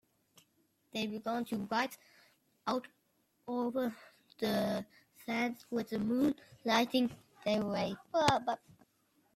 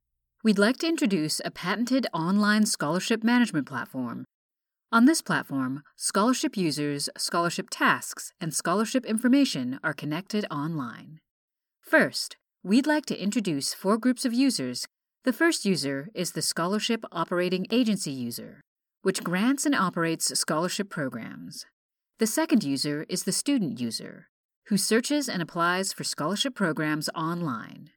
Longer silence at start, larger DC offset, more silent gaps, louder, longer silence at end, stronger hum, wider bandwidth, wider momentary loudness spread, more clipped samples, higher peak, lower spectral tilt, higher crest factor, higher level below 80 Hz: first, 0.95 s vs 0.45 s; neither; second, none vs 4.34-4.49 s, 11.31-11.48 s, 18.67-18.76 s, 21.73-21.89 s, 24.29-24.49 s, 24.56-24.62 s; second, -35 LUFS vs -26 LUFS; first, 0.8 s vs 0.1 s; neither; second, 15.5 kHz vs 19 kHz; about the same, 12 LU vs 11 LU; neither; second, -12 dBFS vs -8 dBFS; about the same, -5 dB/octave vs -4 dB/octave; about the same, 24 dB vs 20 dB; first, -72 dBFS vs -78 dBFS